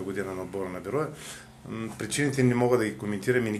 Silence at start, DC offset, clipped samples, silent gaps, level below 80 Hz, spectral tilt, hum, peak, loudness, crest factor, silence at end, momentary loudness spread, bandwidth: 0 s; under 0.1%; under 0.1%; none; -60 dBFS; -5.5 dB/octave; none; -10 dBFS; -28 LUFS; 18 dB; 0 s; 16 LU; 14 kHz